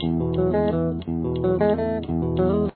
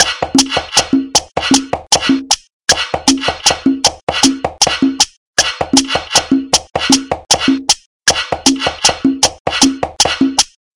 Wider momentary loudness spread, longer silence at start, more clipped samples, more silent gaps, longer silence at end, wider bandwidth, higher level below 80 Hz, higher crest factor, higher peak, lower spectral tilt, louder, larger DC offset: first, 5 LU vs 2 LU; about the same, 0 s vs 0 s; second, under 0.1% vs 0.4%; second, none vs 2.53-2.60 s, 4.03-4.07 s, 5.17-5.34 s, 7.86-8.00 s, 9.40-9.45 s; second, 0.05 s vs 0.3 s; second, 4.5 kHz vs 12 kHz; about the same, -38 dBFS vs -42 dBFS; about the same, 14 dB vs 14 dB; second, -8 dBFS vs 0 dBFS; first, -12.5 dB/octave vs -1.5 dB/octave; second, -23 LUFS vs -12 LUFS; neither